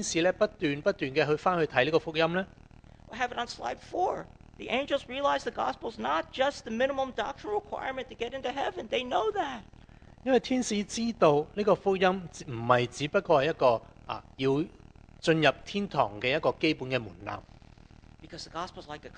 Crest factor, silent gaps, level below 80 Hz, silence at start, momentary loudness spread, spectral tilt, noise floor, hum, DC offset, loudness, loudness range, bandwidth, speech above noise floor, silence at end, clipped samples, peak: 24 dB; none; -56 dBFS; 0 s; 14 LU; -4.5 dB/octave; -53 dBFS; none; under 0.1%; -29 LUFS; 5 LU; 10 kHz; 24 dB; 0 s; under 0.1%; -6 dBFS